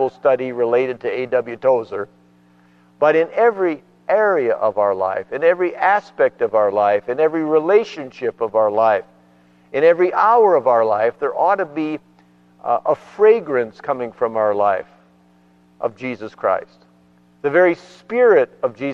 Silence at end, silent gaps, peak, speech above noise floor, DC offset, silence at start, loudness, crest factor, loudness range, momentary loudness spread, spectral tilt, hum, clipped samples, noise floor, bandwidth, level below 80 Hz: 0 s; none; -2 dBFS; 36 dB; under 0.1%; 0 s; -18 LUFS; 16 dB; 6 LU; 12 LU; -7 dB/octave; 60 Hz at -55 dBFS; under 0.1%; -53 dBFS; 6.8 kHz; -68 dBFS